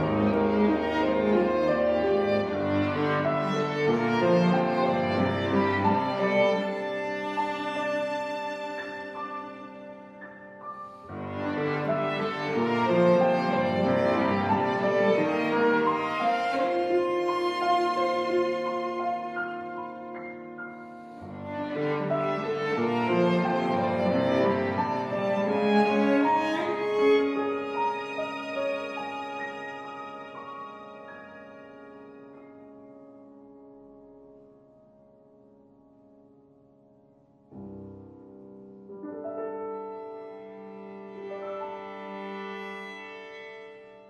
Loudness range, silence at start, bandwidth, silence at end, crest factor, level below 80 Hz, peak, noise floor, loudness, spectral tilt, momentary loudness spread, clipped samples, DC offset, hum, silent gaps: 15 LU; 0 s; 11 kHz; 0 s; 18 dB; -62 dBFS; -10 dBFS; -59 dBFS; -27 LUFS; -7 dB/octave; 20 LU; under 0.1%; under 0.1%; none; none